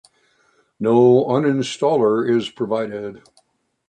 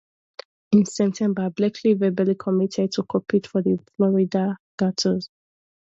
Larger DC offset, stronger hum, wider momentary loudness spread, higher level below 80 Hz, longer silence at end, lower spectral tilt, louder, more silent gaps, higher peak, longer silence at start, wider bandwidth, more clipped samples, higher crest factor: neither; neither; first, 13 LU vs 7 LU; about the same, -64 dBFS vs -64 dBFS; about the same, 0.7 s vs 0.7 s; about the same, -6.5 dB/octave vs -6.5 dB/octave; first, -18 LUFS vs -22 LUFS; second, none vs 4.60-4.78 s; about the same, -4 dBFS vs -6 dBFS; about the same, 0.8 s vs 0.7 s; first, 9.4 kHz vs 8 kHz; neither; about the same, 16 dB vs 18 dB